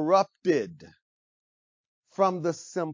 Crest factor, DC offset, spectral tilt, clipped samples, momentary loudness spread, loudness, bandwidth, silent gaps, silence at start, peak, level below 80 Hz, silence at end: 20 dB; under 0.1%; -6 dB/octave; under 0.1%; 12 LU; -27 LUFS; 7.6 kHz; 1.02-2.02 s; 0 s; -8 dBFS; -74 dBFS; 0 s